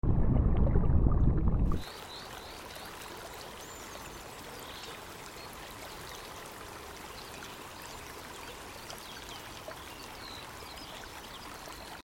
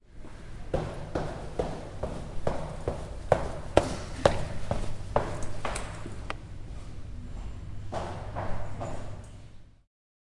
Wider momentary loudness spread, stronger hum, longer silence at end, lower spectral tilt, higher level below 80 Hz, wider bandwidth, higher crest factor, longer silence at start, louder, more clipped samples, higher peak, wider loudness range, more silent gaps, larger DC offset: about the same, 16 LU vs 16 LU; neither; second, 0 s vs 0.7 s; about the same, -5.5 dB/octave vs -6 dB/octave; about the same, -36 dBFS vs -40 dBFS; first, 17 kHz vs 11.5 kHz; second, 22 dB vs 30 dB; about the same, 0.05 s vs 0.05 s; second, -37 LUFS vs -34 LUFS; neither; second, -10 dBFS vs -2 dBFS; about the same, 11 LU vs 9 LU; neither; neither